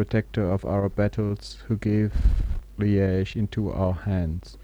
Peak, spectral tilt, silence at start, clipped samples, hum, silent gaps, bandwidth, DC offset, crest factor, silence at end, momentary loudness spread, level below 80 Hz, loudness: -8 dBFS; -8.5 dB/octave; 0 s; under 0.1%; none; none; 9.4 kHz; under 0.1%; 16 dB; 0 s; 7 LU; -30 dBFS; -26 LUFS